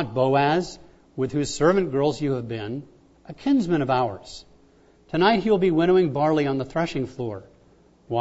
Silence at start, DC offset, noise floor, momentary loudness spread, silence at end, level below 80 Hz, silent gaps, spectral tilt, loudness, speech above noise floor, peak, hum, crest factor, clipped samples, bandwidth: 0 s; under 0.1%; -56 dBFS; 15 LU; 0 s; -52 dBFS; none; -6.5 dB/octave; -23 LUFS; 34 dB; -6 dBFS; none; 16 dB; under 0.1%; 8 kHz